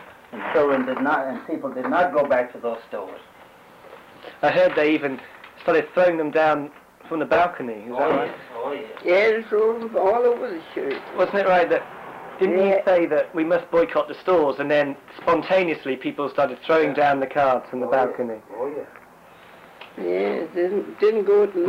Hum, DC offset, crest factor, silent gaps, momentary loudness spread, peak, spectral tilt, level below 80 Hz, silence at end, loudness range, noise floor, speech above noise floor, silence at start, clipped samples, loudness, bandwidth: none; under 0.1%; 12 dB; none; 13 LU; -10 dBFS; -6.5 dB/octave; -62 dBFS; 0 s; 4 LU; -48 dBFS; 27 dB; 0 s; under 0.1%; -22 LUFS; 15 kHz